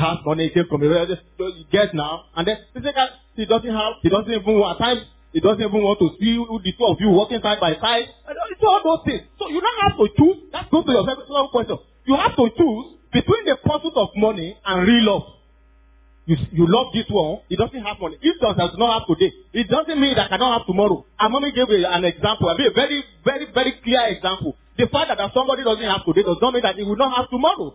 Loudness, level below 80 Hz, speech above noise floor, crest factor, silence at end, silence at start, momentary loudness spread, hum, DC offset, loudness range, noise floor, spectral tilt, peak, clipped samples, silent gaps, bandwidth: -19 LUFS; -44 dBFS; 33 dB; 16 dB; 0.05 s; 0 s; 8 LU; none; under 0.1%; 2 LU; -52 dBFS; -10 dB/octave; -2 dBFS; under 0.1%; none; 4 kHz